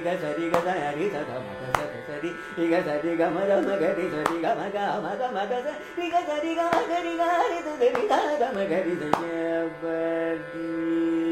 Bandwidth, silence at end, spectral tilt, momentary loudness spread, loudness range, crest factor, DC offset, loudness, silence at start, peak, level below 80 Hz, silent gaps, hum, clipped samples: 15.5 kHz; 0 s; -5.5 dB/octave; 8 LU; 2 LU; 24 dB; under 0.1%; -26 LUFS; 0 s; -2 dBFS; -60 dBFS; none; none; under 0.1%